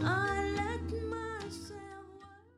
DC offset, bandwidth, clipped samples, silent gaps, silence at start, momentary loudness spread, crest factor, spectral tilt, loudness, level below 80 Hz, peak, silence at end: under 0.1%; 13.5 kHz; under 0.1%; none; 0 s; 19 LU; 16 dB; -5.5 dB/octave; -36 LUFS; -50 dBFS; -20 dBFS; 0.15 s